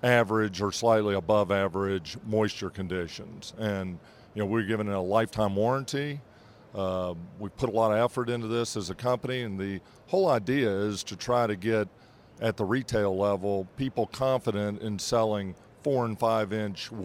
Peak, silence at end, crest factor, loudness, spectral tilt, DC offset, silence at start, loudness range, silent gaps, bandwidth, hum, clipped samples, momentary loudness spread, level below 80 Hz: -8 dBFS; 0 s; 22 dB; -29 LUFS; -5.5 dB/octave; under 0.1%; 0.05 s; 2 LU; none; 16.5 kHz; none; under 0.1%; 10 LU; -60 dBFS